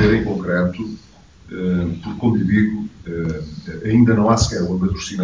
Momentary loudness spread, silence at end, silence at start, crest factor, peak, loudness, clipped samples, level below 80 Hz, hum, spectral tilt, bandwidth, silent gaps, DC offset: 15 LU; 0 s; 0 s; 16 dB; -2 dBFS; -19 LUFS; under 0.1%; -34 dBFS; none; -6.5 dB/octave; 7.6 kHz; none; 0.1%